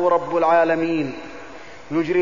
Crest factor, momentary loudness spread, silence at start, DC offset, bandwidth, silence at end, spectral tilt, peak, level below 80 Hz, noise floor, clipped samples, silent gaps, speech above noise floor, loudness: 14 dB; 21 LU; 0 s; 0.8%; 7.4 kHz; 0 s; -7 dB/octave; -6 dBFS; -56 dBFS; -40 dBFS; under 0.1%; none; 21 dB; -20 LUFS